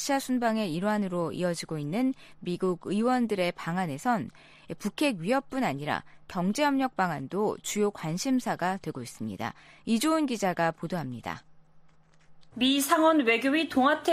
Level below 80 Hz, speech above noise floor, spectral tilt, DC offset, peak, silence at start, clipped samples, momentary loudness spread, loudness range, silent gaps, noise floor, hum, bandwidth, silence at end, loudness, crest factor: -64 dBFS; 28 dB; -4.5 dB/octave; under 0.1%; -12 dBFS; 0 s; under 0.1%; 13 LU; 3 LU; none; -56 dBFS; none; 15 kHz; 0 s; -28 LUFS; 18 dB